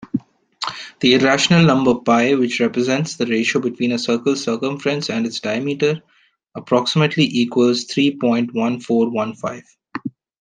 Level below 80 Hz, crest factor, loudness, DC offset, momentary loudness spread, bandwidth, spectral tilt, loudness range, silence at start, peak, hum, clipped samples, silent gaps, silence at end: -58 dBFS; 18 dB; -18 LUFS; under 0.1%; 15 LU; 9.8 kHz; -5 dB/octave; 4 LU; 0 s; 0 dBFS; none; under 0.1%; none; 0.3 s